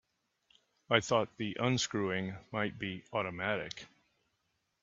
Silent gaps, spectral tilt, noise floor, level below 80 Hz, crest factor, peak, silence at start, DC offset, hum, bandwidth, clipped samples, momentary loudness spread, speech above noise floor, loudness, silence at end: none; -3.5 dB/octave; -81 dBFS; -70 dBFS; 26 dB; -10 dBFS; 0.9 s; under 0.1%; none; 7.8 kHz; under 0.1%; 9 LU; 46 dB; -34 LUFS; 0.95 s